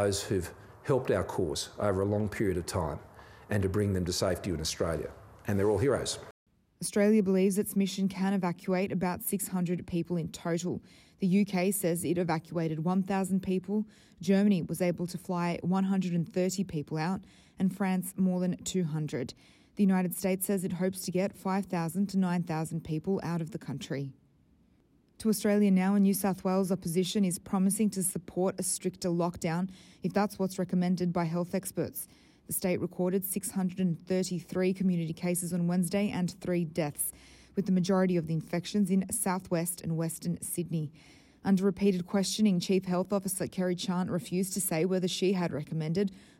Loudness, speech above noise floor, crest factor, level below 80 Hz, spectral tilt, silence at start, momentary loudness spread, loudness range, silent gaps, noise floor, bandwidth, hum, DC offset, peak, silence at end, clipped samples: -31 LUFS; 36 dB; 16 dB; -60 dBFS; -5.5 dB/octave; 0 s; 8 LU; 3 LU; 6.31-6.46 s; -66 dBFS; 16 kHz; none; under 0.1%; -14 dBFS; 0.2 s; under 0.1%